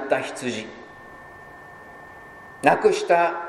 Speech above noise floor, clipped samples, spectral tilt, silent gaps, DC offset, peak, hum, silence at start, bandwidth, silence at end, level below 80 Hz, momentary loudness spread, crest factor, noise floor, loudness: 22 dB; under 0.1%; -4 dB/octave; none; under 0.1%; 0 dBFS; none; 0 s; 15 kHz; 0 s; -62 dBFS; 24 LU; 24 dB; -43 dBFS; -22 LUFS